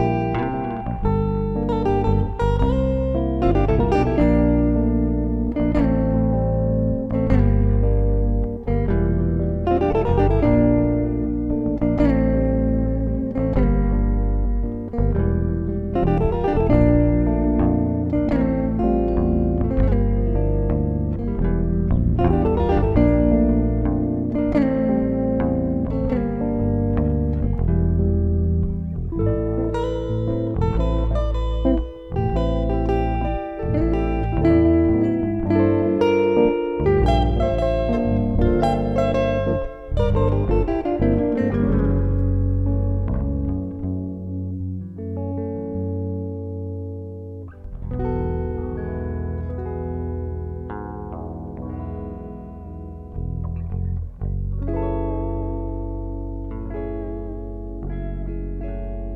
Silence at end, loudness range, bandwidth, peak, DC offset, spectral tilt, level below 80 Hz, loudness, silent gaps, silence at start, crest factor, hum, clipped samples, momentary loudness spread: 0 s; 10 LU; 5.8 kHz; -2 dBFS; under 0.1%; -10 dB/octave; -26 dBFS; -21 LUFS; none; 0 s; 18 dB; none; under 0.1%; 12 LU